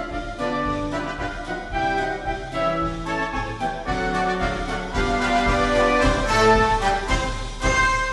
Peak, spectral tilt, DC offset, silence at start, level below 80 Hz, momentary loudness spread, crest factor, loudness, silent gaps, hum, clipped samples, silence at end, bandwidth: -6 dBFS; -4.5 dB/octave; under 0.1%; 0 s; -32 dBFS; 10 LU; 16 dB; -22 LUFS; none; none; under 0.1%; 0 s; 11.5 kHz